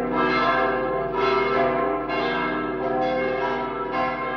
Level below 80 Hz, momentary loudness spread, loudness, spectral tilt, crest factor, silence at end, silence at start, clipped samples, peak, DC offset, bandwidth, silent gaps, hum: -48 dBFS; 5 LU; -23 LUFS; -6.5 dB/octave; 14 dB; 0 s; 0 s; under 0.1%; -10 dBFS; under 0.1%; 6.4 kHz; none; none